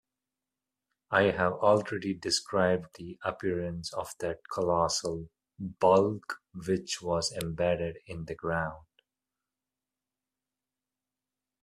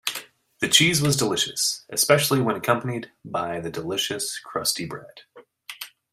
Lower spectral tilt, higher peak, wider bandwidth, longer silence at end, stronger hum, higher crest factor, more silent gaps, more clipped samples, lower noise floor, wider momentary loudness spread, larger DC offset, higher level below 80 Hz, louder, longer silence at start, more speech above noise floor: first, -4.5 dB/octave vs -3 dB/octave; second, -8 dBFS vs -2 dBFS; second, 14.5 kHz vs 16 kHz; first, 2.85 s vs 0.25 s; first, 50 Hz at -65 dBFS vs none; about the same, 22 dB vs 24 dB; neither; neither; first, under -90 dBFS vs -44 dBFS; second, 14 LU vs 18 LU; neither; about the same, -60 dBFS vs -60 dBFS; second, -30 LUFS vs -22 LUFS; first, 1.1 s vs 0.05 s; first, over 60 dB vs 20 dB